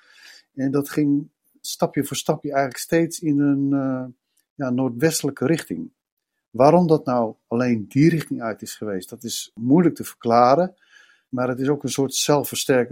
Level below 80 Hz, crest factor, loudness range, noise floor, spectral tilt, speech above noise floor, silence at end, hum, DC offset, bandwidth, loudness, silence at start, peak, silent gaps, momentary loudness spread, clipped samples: -62 dBFS; 20 dB; 3 LU; -49 dBFS; -5.5 dB/octave; 29 dB; 0 s; none; under 0.1%; 16.5 kHz; -21 LUFS; 0.55 s; -2 dBFS; 4.50-4.56 s, 6.12-6.17 s, 6.48-6.52 s; 13 LU; under 0.1%